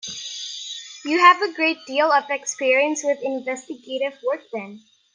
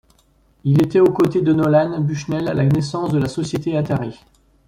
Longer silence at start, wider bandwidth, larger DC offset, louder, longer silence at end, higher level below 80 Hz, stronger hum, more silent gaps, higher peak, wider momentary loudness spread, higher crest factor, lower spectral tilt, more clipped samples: second, 0.05 s vs 0.65 s; second, 10 kHz vs 13 kHz; neither; second, -21 LUFS vs -18 LUFS; second, 0.35 s vs 0.55 s; second, -78 dBFS vs -50 dBFS; neither; neither; first, 0 dBFS vs -4 dBFS; first, 17 LU vs 8 LU; first, 22 dB vs 14 dB; second, -1.5 dB/octave vs -8 dB/octave; neither